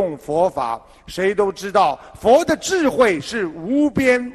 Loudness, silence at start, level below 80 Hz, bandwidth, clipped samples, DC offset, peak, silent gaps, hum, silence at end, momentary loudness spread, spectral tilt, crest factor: -18 LUFS; 0 s; -48 dBFS; 13 kHz; under 0.1%; under 0.1%; -2 dBFS; none; none; 0 s; 9 LU; -4.5 dB/octave; 16 dB